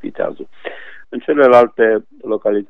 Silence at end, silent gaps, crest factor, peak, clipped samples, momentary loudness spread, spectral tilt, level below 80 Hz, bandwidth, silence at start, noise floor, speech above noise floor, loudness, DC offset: 0.05 s; none; 16 dB; 0 dBFS; 0.1%; 21 LU; -7 dB/octave; -62 dBFS; 6.6 kHz; 0.05 s; -32 dBFS; 18 dB; -14 LUFS; under 0.1%